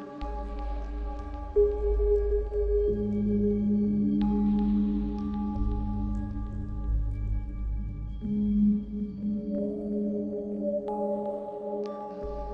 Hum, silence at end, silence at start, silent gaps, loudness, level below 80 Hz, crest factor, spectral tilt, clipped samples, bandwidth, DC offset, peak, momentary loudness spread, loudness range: none; 0 s; 0 s; none; -30 LUFS; -34 dBFS; 16 dB; -11 dB/octave; under 0.1%; 4.8 kHz; under 0.1%; -14 dBFS; 11 LU; 5 LU